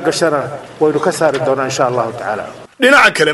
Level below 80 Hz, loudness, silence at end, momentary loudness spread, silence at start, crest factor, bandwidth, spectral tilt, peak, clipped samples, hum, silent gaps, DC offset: -54 dBFS; -14 LUFS; 0 s; 14 LU; 0 s; 14 dB; 14 kHz; -3.5 dB/octave; 0 dBFS; under 0.1%; none; none; under 0.1%